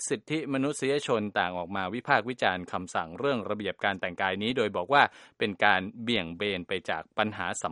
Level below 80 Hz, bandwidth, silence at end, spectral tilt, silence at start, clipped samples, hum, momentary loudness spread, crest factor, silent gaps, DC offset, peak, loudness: -66 dBFS; 11.5 kHz; 0 s; -4 dB/octave; 0 s; under 0.1%; none; 8 LU; 24 dB; none; under 0.1%; -4 dBFS; -29 LUFS